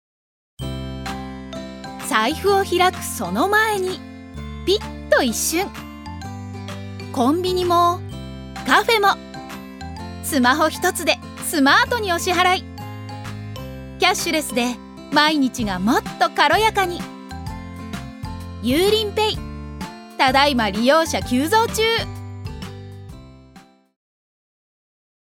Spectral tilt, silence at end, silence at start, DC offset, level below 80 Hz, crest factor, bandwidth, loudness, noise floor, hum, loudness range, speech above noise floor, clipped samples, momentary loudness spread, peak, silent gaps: -3.5 dB/octave; 1.7 s; 0.6 s; under 0.1%; -42 dBFS; 20 dB; 18 kHz; -19 LUFS; -48 dBFS; none; 5 LU; 30 dB; under 0.1%; 17 LU; 0 dBFS; none